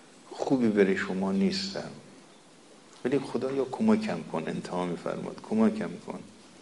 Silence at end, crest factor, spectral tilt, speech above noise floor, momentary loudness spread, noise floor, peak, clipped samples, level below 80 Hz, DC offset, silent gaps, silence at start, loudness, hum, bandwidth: 0.15 s; 20 dB; -6 dB/octave; 26 dB; 16 LU; -55 dBFS; -10 dBFS; under 0.1%; -70 dBFS; under 0.1%; none; 0.25 s; -29 LUFS; none; 11.5 kHz